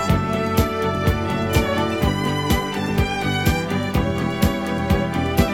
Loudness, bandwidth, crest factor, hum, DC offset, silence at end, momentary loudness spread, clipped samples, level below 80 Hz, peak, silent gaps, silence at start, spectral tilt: -21 LUFS; 18 kHz; 20 dB; none; 0.3%; 0 s; 2 LU; under 0.1%; -30 dBFS; 0 dBFS; none; 0 s; -6 dB/octave